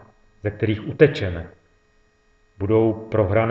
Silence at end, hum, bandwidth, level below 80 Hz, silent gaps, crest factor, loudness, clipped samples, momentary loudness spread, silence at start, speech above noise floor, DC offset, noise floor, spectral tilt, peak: 0 s; none; 7.4 kHz; -48 dBFS; none; 22 dB; -21 LUFS; under 0.1%; 13 LU; 0.45 s; 40 dB; under 0.1%; -60 dBFS; -9 dB/octave; 0 dBFS